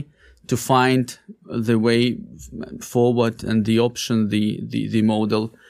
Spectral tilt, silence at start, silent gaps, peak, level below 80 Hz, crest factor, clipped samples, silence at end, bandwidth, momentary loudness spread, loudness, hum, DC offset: -6 dB/octave; 0 s; none; -2 dBFS; -52 dBFS; 18 dB; under 0.1%; 0.2 s; 15.5 kHz; 16 LU; -20 LUFS; none; under 0.1%